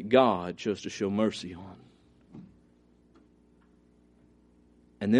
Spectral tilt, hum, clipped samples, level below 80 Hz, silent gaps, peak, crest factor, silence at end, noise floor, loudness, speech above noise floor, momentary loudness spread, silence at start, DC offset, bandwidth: -6 dB/octave; 60 Hz at -65 dBFS; under 0.1%; -66 dBFS; none; -8 dBFS; 24 dB; 0 s; -62 dBFS; -29 LUFS; 35 dB; 28 LU; 0 s; under 0.1%; 10.5 kHz